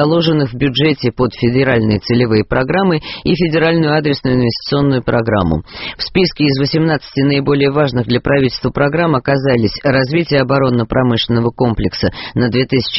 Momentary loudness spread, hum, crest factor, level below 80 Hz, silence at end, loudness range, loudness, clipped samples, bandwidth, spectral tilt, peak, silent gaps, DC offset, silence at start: 4 LU; none; 14 dB; -36 dBFS; 0 s; 1 LU; -14 LUFS; under 0.1%; 6 kHz; -5 dB/octave; 0 dBFS; none; under 0.1%; 0 s